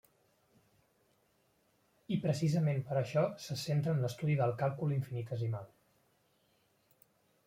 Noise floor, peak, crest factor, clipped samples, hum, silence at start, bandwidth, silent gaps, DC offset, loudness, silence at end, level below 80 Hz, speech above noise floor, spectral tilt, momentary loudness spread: -74 dBFS; -18 dBFS; 18 dB; under 0.1%; none; 2.1 s; 15.5 kHz; none; under 0.1%; -35 LUFS; 1.8 s; -72 dBFS; 40 dB; -7 dB/octave; 7 LU